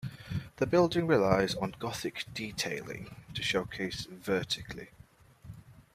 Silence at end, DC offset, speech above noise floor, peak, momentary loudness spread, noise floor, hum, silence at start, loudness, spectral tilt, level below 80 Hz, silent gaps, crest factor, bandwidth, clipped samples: 0.15 s; under 0.1%; 25 dB; -12 dBFS; 19 LU; -57 dBFS; none; 0 s; -32 LUFS; -5 dB/octave; -58 dBFS; none; 22 dB; 15.5 kHz; under 0.1%